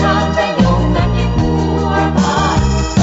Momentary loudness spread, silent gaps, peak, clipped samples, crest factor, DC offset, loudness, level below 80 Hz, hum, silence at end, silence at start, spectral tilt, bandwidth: 2 LU; none; 0 dBFS; under 0.1%; 12 dB; under 0.1%; -14 LUFS; -20 dBFS; none; 0 s; 0 s; -5.5 dB/octave; 8 kHz